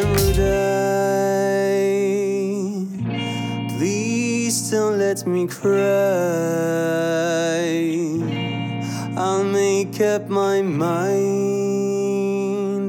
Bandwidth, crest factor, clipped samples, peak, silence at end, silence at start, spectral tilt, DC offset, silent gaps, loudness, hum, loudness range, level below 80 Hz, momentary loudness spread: 19.5 kHz; 16 dB; under 0.1%; -4 dBFS; 0 s; 0 s; -5.5 dB/octave; under 0.1%; none; -20 LUFS; none; 2 LU; -38 dBFS; 6 LU